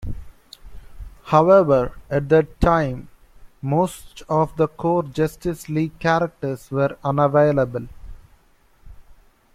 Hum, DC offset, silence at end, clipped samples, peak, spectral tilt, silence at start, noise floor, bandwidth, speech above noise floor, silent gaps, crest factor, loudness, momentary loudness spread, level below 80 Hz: none; under 0.1%; 0.4 s; under 0.1%; -2 dBFS; -7.5 dB/octave; 0 s; -55 dBFS; 15.5 kHz; 36 dB; none; 18 dB; -20 LUFS; 17 LU; -38 dBFS